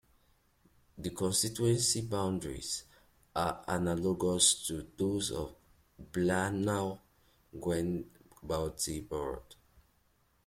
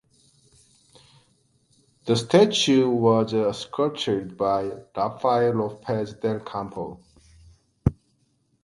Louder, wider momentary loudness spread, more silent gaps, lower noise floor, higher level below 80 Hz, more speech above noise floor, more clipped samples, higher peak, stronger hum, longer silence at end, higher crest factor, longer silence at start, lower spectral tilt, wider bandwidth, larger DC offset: second, -33 LUFS vs -23 LUFS; about the same, 13 LU vs 13 LU; neither; about the same, -71 dBFS vs -68 dBFS; second, -58 dBFS vs -48 dBFS; second, 38 dB vs 45 dB; neither; second, -12 dBFS vs -4 dBFS; neither; about the same, 0.65 s vs 0.7 s; about the same, 22 dB vs 22 dB; second, 0.95 s vs 2.05 s; second, -3.5 dB/octave vs -5.5 dB/octave; first, 16.5 kHz vs 11.5 kHz; neither